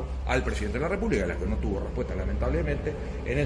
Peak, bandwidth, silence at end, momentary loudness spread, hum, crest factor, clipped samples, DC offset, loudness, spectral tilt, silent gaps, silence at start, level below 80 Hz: -10 dBFS; 10.5 kHz; 0 s; 4 LU; none; 18 dB; under 0.1%; under 0.1%; -29 LUFS; -7 dB/octave; none; 0 s; -32 dBFS